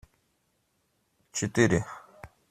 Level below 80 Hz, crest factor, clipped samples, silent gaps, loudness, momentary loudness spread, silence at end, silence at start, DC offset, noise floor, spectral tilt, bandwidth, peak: -56 dBFS; 24 dB; under 0.1%; none; -27 LUFS; 18 LU; 0.25 s; 1.35 s; under 0.1%; -74 dBFS; -5 dB/octave; 14.5 kHz; -8 dBFS